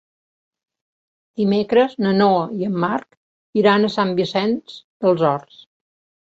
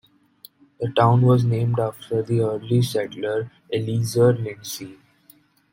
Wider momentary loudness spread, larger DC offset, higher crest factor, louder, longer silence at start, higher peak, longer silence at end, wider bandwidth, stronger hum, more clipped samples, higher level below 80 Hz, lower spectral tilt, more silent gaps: about the same, 11 LU vs 13 LU; neither; about the same, 18 dB vs 20 dB; first, -19 LUFS vs -22 LUFS; first, 1.4 s vs 0.8 s; about the same, -2 dBFS vs -2 dBFS; about the same, 0.9 s vs 0.8 s; second, 7.6 kHz vs 16.5 kHz; neither; neither; about the same, -62 dBFS vs -58 dBFS; about the same, -7.5 dB/octave vs -7 dB/octave; first, 3.17-3.53 s, 4.84-5.00 s vs none